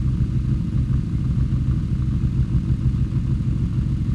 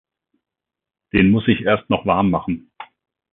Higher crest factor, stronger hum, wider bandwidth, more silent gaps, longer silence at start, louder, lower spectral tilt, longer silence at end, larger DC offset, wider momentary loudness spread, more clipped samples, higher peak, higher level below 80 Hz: second, 12 dB vs 20 dB; neither; first, 6.8 kHz vs 4.2 kHz; neither; second, 0 s vs 1.15 s; second, -22 LUFS vs -18 LUFS; second, -9.5 dB/octave vs -12 dB/octave; second, 0 s vs 0.5 s; neither; second, 1 LU vs 9 LU; neither; second, -10 dBFS vs -2 dBFS; first, -26 dBFS vs -42 dBFS